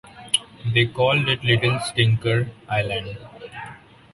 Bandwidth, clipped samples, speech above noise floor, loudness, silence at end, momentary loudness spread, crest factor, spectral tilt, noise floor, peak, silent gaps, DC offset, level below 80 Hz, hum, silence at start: 11.5 kHz; under 0.1%; 21 dB; -21 LUFS; 0.4 s; 18 LU; 20 dB; -4.5 dB/octave; -42 dBFS; -2 dBFS; none; under 0.1%; -50 dBFS; none; 0.05 s